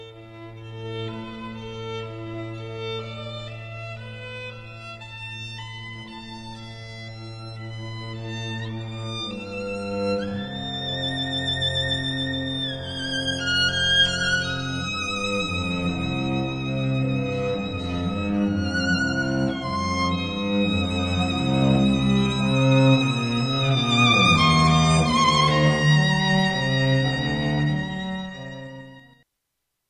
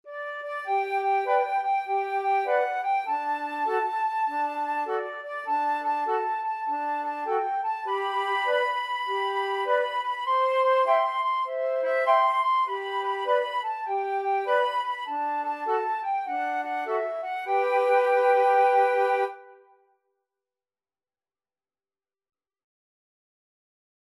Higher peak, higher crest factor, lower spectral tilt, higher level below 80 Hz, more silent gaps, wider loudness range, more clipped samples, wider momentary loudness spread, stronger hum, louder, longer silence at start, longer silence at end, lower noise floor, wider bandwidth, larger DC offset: first, -4 dBFS vs -10 dBFS; about the same, 20 dB vs 16 dB; first, -5 dB/octave vs -1 dB/octave; first, -44 dBFS vs under -90 dBFS; neither; first, 16 LU vs 4 LU; neither; first, 19 LU vs 8 LU; neither; first, -22 LUFS vs -26 LUFS; about the same, 0 s vs 0.05 s; second, 0.9 s vs 4.6 s; second, -79 dBFS vs under -90 dBFS; second, 10.5 kHz vs 12.5 kHz; neither